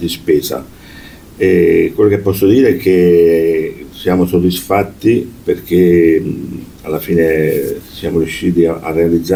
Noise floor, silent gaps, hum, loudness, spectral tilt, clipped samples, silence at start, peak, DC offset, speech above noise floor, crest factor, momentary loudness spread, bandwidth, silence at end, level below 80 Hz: -35 dBFS; none; none; -13 LUFS; -6.5 dB/octave; under 0.1%; 0 s; 0 dBFS; under 0.1%; 23 dB; 12 dB; 12 LU; 19 kHz; 0 s; -38 dBFS